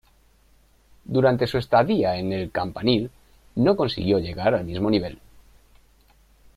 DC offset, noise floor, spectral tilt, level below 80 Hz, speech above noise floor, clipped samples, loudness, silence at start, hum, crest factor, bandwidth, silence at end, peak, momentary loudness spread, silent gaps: under 0.1%; -58 dBFS; -7.5 dB/octave; -50 dBFS; 36 dB; under 0.1%; -23 LUFS; 1.1 s; none; 18 dB; 14.5 kHz; 1.4 s; -6 dBFS; 7 LU; none